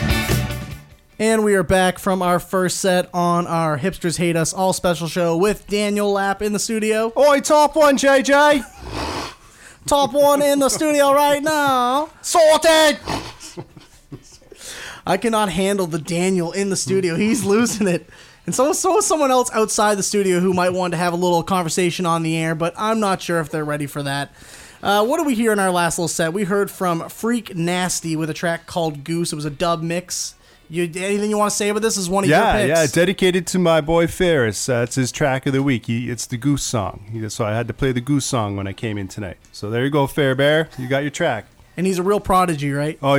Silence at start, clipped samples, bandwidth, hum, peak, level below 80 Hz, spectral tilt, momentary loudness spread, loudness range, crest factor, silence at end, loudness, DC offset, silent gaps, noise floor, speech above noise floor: 0 s; under 0.1%; 16.5 kHz; none; -4 dBFS; -42 dBFS; -4.5 dB/octave; 11 LU; 6 LU; 14 dB; 0 s; -18 LUFS; under 0.1%; none; -45 dBFS; 27 dB